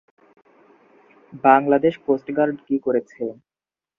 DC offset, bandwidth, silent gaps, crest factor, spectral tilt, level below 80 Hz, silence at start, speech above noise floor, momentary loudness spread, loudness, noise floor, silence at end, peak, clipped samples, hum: under 0.1%; 5.2 kHz; none; 22 dB; -8.5 dB/octave; -66 dBFS; 1.35 s; over 70 dB; 15 LU; -20 LUFS; under -90 dBFS; 0.65 s; 0 dBFS; under 0.1%; none